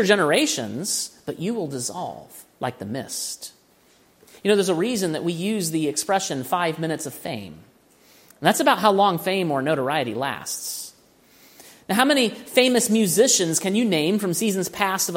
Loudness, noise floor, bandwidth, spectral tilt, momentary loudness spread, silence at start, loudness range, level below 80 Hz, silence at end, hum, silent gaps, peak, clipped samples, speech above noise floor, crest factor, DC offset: -22 LUFS; -57 dBFS; 16.5 kHz; -3.5 dB/octave; 14 LU; 0 s; 8 LU; -68 dBFS; 0 s; none; none; -2 dBFS; under 0.1%; 35 dB; 22 dB; under 0.1%